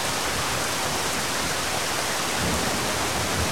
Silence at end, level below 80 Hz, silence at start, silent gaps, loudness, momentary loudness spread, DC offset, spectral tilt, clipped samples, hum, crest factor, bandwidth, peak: 0 s; -44 dBFS; 0 s; none; -24 LUFS; 1 LU; 1%; -2 dB/octave; under 0.1%; none; 16 dB; 16.5 kHz; -10 dBFS